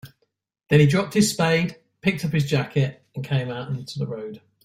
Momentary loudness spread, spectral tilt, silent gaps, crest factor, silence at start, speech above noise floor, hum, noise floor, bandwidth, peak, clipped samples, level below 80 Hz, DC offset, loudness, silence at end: 13 LU; -5.5 dB/octave; none; 20 dB; 0.05 s; 51 dB; none; -72 dBFS; 15.5 kHz; -4 dBFS; under 0.1%; -56 dBFS; under 0.1%; -23 LUFS; 0.25 s